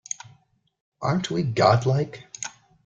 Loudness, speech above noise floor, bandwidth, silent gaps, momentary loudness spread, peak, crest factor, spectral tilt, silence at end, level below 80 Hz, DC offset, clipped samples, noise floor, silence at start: -23 LUFS; 39 dB; 8.8 kHz; none; 16 LU; -4 dBFS; 22 dB; -5.5 dB/octave; 0.35 s; -58 dBFS; under 0.1%; under 0.1%; -61 dBFS; 1 s